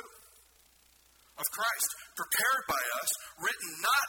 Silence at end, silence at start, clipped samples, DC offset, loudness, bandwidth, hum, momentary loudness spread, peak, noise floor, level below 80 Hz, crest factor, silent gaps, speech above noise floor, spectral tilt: 0 s; 0 s; under 0.1%; under 0.1%; -31 LUFS; 19 kHz; none; 8 LU; -14 dBFS; -64 dBFS; -70 dBFS; 20 dB; none; 32 dB; 1 dB/octave